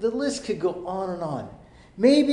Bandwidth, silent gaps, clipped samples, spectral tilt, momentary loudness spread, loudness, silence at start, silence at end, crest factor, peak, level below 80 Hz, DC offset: 11 kHz; none; under 0.1%; -5.5 dB/octave; 13 LU; -25 LUFS; 0 s; 0 s; 18 dB; -6 dBFS; -56 dBFS; under 0.1%